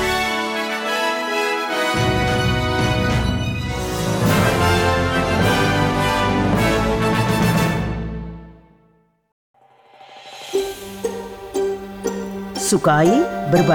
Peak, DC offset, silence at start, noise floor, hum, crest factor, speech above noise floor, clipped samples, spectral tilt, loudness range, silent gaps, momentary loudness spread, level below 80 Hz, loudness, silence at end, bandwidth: -6 dBFS; under 0.1%; 0 s; -58 dBFS; none; 14 dB; 43 dB; under 0.1%; -5 dB/octave; 11 LU; 9.32-9.54 s; 11 LU; -34 dBFS; -19 LUFS; 0 s; 19 kHz